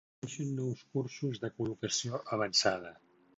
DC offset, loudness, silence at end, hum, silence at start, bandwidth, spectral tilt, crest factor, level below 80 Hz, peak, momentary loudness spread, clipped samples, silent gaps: under 0.1%; -34 LUFS; 0.45 s; none; 0.25 s; 8 kHz; -4 dB/octave; 22 dB; -70 dBFS; -14 dBFS; 11 LU; under 0.1%; none